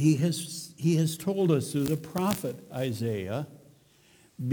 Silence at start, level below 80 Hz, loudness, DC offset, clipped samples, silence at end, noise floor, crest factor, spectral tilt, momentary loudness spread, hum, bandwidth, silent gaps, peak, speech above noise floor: 0 s; -64 dBFS; -29 LUFS; under 0.1%; under 0.1%; 0 s; -60 dBFS; 18 dB; -6 dB/octave; 10 LU; none; over 20 kHz; none; -10 dBFS; 32 dB